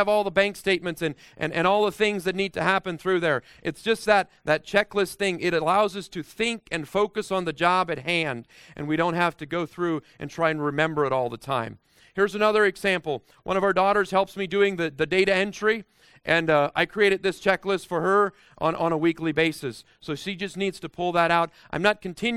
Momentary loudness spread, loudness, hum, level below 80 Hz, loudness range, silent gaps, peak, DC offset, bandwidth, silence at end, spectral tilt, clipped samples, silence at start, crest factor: 10 LU; -24 LUFS; none; -58 dBFS; 3 LU; none; -4 dBFS; under 0.1%; 15 kHz; 0 s; -5 dB/octave; under 0.1%; 0 s; 20 dB